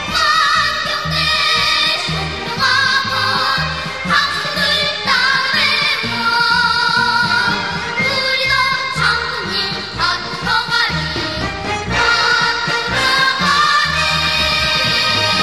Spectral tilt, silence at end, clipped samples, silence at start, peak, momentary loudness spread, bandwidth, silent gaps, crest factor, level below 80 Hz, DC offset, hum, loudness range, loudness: -2.5 dB/octave; 0 s; under 0.1%; 0 s; -2 dBFS; 6 LU; 13.5 kHz; none; 14 dB; -38 dBFS; 0.5%; none; 3 LU; -14 LUFS